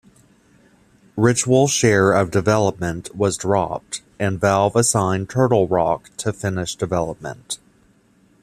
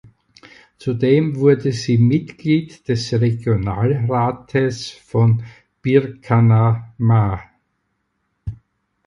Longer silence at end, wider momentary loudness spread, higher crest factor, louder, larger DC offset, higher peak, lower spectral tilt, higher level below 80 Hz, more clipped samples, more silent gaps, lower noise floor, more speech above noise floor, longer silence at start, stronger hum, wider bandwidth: first, 0.85 s vs 0.5 s; about the same, 13 LU vs 12 LU; about the same, 18 dB vs 18 dB; about the same, -19 LUFS vs -18 LUFS; neither; about the same, -2 dBFS vs 0 dBFS; second, -5 dB/octave vs -8 dB/octave; second, -50 dBFS vs -44 dBFS; neither; neither; second, -56 dBFS vs -70 dBFS; second, 38 dB vs 54 dB; first, 1.15 s vs 0.8 s; neither; first, 14.5 kHz vs 7.6 kHz